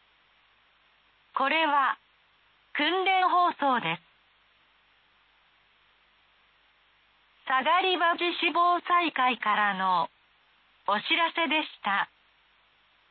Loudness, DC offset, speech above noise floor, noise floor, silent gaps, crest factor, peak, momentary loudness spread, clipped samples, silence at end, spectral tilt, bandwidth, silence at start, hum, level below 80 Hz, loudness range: -26 LUFS; under 0.1%; 39 dB; -65 dBFS; none; 16 dB; -14 dBFS; 12 LU; under 0.1%; 1.05 s; -7 dB/octave; 4.6 kHz; 1.35 s; none; -82 dBFS; 7 LU